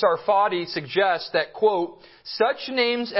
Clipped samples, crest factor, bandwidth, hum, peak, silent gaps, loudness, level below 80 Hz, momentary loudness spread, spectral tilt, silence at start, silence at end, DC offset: under 0.1%; 16 dB; 5.8 kHz; none; -6 dBFS; none; -23 LUFS; -70 dBFS; 8 LU; -8 dB/octave; 0 s; 0 s; under 0.1%